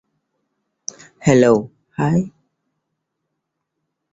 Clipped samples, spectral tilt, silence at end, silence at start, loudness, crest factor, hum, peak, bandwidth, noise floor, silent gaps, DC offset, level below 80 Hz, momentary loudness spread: under 0.1%; -6.5 dB/octave; 1.85 s; 1.25 s; -17 LUFS; 20 dB; none; -2 dBFS; 8 kHz; -77 dBFS; none; under 0.1%; -56 dBFS; 19 LU